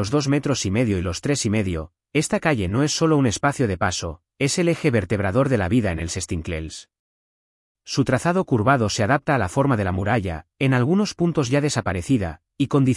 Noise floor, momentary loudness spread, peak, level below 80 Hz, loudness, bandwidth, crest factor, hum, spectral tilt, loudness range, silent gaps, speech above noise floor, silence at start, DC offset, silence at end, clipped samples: under -90 dBFS; 8 LU; -6 dBFS; -48 dBFS; -22 LUFS; 12 kHz; 16 dB; none; -5.5 dB/octave; 3 LU; 6.99-7.75 s; over 69 dB; 0 s; under 0.1%; 0 s; under 0.1%